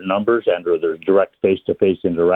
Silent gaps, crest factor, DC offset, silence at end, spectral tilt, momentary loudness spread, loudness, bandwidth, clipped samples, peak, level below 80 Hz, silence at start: none; 14 dB; under 0.1%; 0 s; -9 dB/octave; 2 LU; -18 LUFS; 4 kHz; under 0.1%; -2 dBFS; -56 dBFS; 0 s